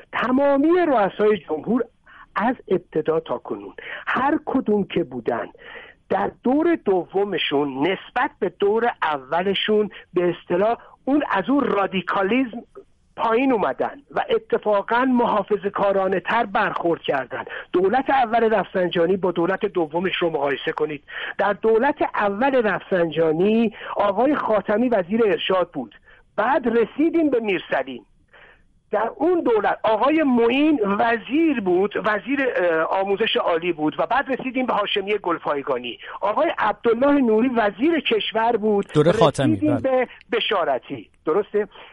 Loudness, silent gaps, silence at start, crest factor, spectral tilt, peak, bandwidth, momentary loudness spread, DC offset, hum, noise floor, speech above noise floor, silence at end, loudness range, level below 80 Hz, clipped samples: -21 LUFS; none; 0.1 s; 18 dB; -6.5 dB/octave; -4 dBFS; 11 kHz; 8 LU; under 0.1%; none; -53 dBFS; 32 dB; 0.05 s; 3 LU; -56 dBFS; under 0.1%